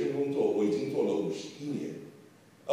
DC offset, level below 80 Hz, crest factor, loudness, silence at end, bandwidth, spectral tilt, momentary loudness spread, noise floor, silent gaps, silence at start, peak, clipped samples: under 0.1%; -82 dBFS; 14 dB; -31 LUFS; 0 s; 13 kHz; -6.5 dB/octave; 17 LU; -57 dBFS; none; 0 s; -18 dBFS; under 0.1%